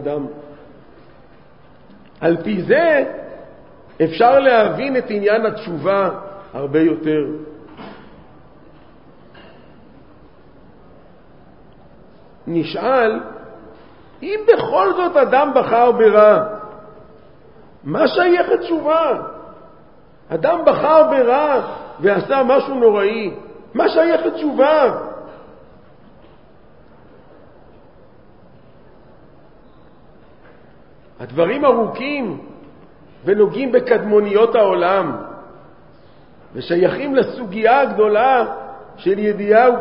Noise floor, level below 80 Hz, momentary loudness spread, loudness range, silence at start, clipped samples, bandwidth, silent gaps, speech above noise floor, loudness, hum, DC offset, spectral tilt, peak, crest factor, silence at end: -48 dBFS; -56 dBFS; 20 LU; 8 LU; 0 s; under 0.1%; 5.6 kHz; none; 33 dB; -16 LUFS; none; 0.4%; -10 dB/octave; 0 dBFS; 18 dB; 0 s